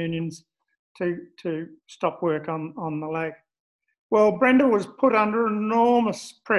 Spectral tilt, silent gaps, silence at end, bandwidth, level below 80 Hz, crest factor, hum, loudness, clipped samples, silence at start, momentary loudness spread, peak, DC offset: -6.5 dB/octave; 0.79-0.95 s, 3.60-3.79 s, 3.99-4.10 s; 0 s; 11.5 kHz; -66 dBFS; 18 dB; none; -23 LUFS; under 0.1%; 0 s; 14 LU; -6 dBFS; under 0.1%